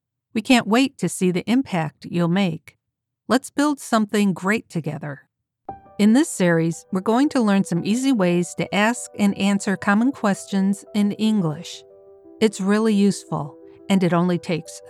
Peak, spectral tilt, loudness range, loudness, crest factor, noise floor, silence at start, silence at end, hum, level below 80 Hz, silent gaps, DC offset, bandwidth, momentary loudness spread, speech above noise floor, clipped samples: -4 dBFS; -5.5 dB/octave; 3 LU; -21 LUFS; 18 dB; -80 dBFS; 0.35 s; 0 s; none; -66 dBFS; none; under 0.1%; 13.5 kHz; 11 LU; 60 dB; under 0.1%